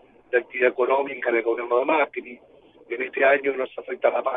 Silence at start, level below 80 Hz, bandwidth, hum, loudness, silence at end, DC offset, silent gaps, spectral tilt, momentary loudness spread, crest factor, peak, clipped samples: 0.3 s; -72 dBFS; 4.5 kHz; none; -23 LUFS; 0 s; under 0.1%; none; -7 dB/octave; 11 LU; 18 dB; -6 dBFS; under 0.1%